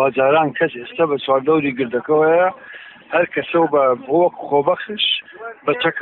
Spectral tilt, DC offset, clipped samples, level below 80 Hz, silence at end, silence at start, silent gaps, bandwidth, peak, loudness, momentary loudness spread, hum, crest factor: -9 dB/octave; under 0.1%; under 0.1%; -62 dBFS; 0 s; 0 s; none; 4.2 kHz; -4 dBFS; -17 LUFS; 7 LU; none; 14 dB